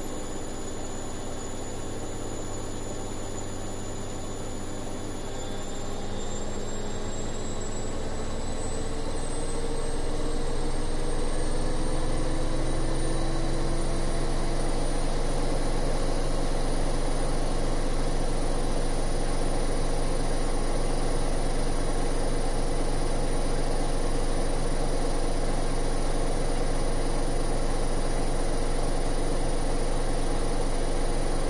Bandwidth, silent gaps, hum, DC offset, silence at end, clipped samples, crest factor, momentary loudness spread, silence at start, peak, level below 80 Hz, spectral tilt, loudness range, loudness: 11.5 kHz; none; none; under 0.1%; 0 s; under 0.1%; 10 dB; 5 LU; 0 s; -14 dBFS; -28 dBFS; -5 dB/octave; 5 LU; -32 LUFS